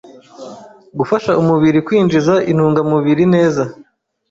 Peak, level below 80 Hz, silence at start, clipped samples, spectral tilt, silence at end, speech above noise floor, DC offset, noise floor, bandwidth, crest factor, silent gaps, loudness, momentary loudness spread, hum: -2 dBFS; -50 dBFS; 0.4 s; under 0.1%; -7.5 dB/octave; 0.6 s; 22 dB; under 0.1%; -35 dBFS; 7.8 kHz; 12 dB; none; -14 LUFS; 16 LU; none